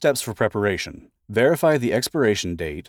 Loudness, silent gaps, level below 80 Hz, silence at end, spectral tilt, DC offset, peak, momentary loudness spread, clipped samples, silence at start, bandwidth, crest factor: -21 LUFS; none; -52 dBFS; 0.05 s; -4.5 dB/octave; under 0.1%; -6 dBFS; 9 LU; under 0.1%; 0 s; over 20 kHz; 16 dB